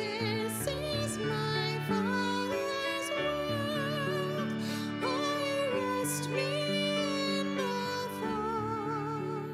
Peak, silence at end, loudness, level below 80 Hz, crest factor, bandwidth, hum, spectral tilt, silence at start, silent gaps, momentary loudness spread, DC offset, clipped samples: -18 dBFS; 0 s; -32 LUFS; -60 dBFS; 14 dB; 16 kHz; none; -4.5 dB/octave; 0 s; none; 4 LU; under 0.1%; under 0.1%